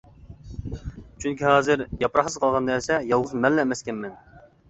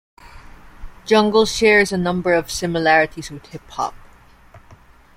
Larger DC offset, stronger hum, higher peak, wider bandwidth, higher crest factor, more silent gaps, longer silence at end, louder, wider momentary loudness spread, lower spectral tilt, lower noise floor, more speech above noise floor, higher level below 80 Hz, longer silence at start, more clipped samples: neither; neither; about the same, -4 dBFS vs -2 dBFS; second, 8.4 kHz vs 16 kHz; about the same, 22 dB vs 18 dB; neither; second, 0.3 s vs 0.6 s; second, -23 LUFS vs -17 LUFS; about the same, 17 LU vs 19 LU; about the same, -5 dB/octave vs -4 dB/octave; second, -43 dBFS vs -47 dBFS; second, 20 dB vs 29 dB; about the same, -46 dBFS vs -44 dBFS; about the same, 0.25 s vs 0.35 s; neither